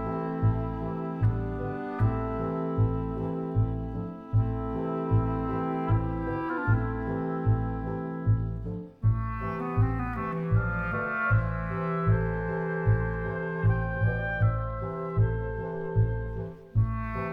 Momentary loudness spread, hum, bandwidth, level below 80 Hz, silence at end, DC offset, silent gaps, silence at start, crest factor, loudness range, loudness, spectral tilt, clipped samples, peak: 6 LU; none; 3.6 kHz; -38 dBFS; 0 s; under 0.1%; none; 0 s; 16 dB; 2 LU; -29 LUFS; -11 dB/octave; under 0.1%; -12 dBFS